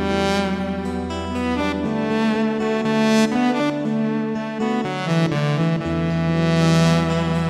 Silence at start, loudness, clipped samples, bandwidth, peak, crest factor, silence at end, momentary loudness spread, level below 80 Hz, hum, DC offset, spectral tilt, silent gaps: 0 s; -20 LUFS; under 0.1%; 12.5 kHz; -6 dBFS; 12 dB; 0 s; 7 LU; -42 dBFS; none; under 0.1%; -6.5 dB/octave; none